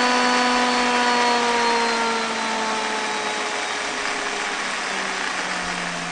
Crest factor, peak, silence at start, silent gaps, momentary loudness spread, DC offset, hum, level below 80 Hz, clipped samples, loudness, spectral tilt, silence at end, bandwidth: 16 dB; -6 dBFS; 0 s; none; 6 LU; under 0.1%; none; -56 dBFS; under 0.1%; -21 LUFS; -1.5 dB/octave; 0 s; 10 kHz